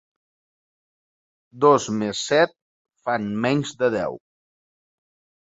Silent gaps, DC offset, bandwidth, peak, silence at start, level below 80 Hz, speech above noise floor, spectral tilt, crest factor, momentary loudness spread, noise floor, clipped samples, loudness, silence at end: 2.62-2.85 s; under 0.1%; 8 kHz; -2 dBFS; 1.55 s; -62 dBFS; over 69 dB; -5 dB/octave; 22 dB; 11 LU; under -90 dBFS; under 0.1%; -22 LUFS; 1.25 s